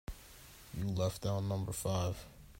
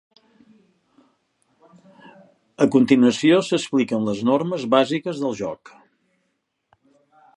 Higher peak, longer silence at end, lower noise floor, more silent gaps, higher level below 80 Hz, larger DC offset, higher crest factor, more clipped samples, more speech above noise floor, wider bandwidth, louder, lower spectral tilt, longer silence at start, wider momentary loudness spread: second, -22 dBFS vs -2 dBFS; second, 0 s vs 1.8 s; second, -56 dBFS vs -73 dBFS; neither; first, -54 dBFS vs -66 dBFS; neither; about the same, 16 dB vs 20 dB; neither; second, 20 dB vs 54 dB; first, 16 kHz vs 11 kHz; second, -38 LUFS vs -20 LUFS; about the same, -6 dB/octave vs -5.5 dB/octave; second, 0.1 s vs 2.6 s; first, 17 LU vs 10 LU